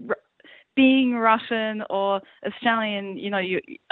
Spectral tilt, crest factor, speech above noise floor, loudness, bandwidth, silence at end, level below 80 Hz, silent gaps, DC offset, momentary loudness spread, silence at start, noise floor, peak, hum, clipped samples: -8.5 dB/octave; 18 dB; 30 dB; -23 LUFS; 4.2 kHz; 0.15 s; -70 dBFS; none; under 0.1%; 11 LU; 0 s; -53 dBFS; -6 dBFS; none; under 0.1%